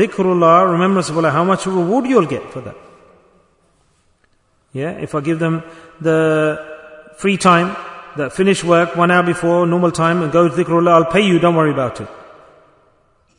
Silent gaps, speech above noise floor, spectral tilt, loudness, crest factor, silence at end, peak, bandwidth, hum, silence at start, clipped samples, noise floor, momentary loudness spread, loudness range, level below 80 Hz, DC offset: none; 44 dB; -6 dB/octave; -15 LUFS; 16 dB; 1.15 s; 0 dBFS; 11 kHz; none; 0 s; under 0.1%; -59 dBFS; 15 LU; 10 LU; -54 dBFS; under 0.1%